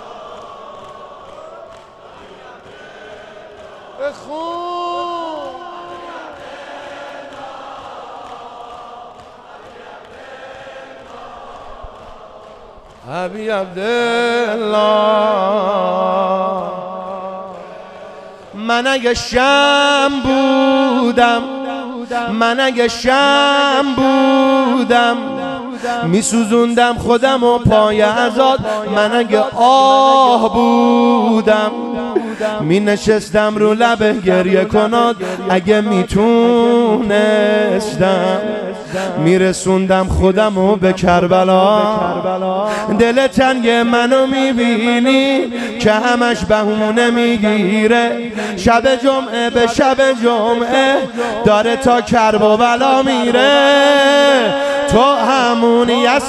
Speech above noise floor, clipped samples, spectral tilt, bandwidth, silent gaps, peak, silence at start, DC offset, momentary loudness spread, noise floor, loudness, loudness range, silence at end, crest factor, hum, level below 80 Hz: 26 dB; under 0.1%; -5 dB/octave; 12.5 kHz; none; 0 dBFS; 0 s; under 0.1%; 20 LU; -38 dBFS; -13 LUFS; 19 LU; 0 s; 14 dB; none; -40 dBFS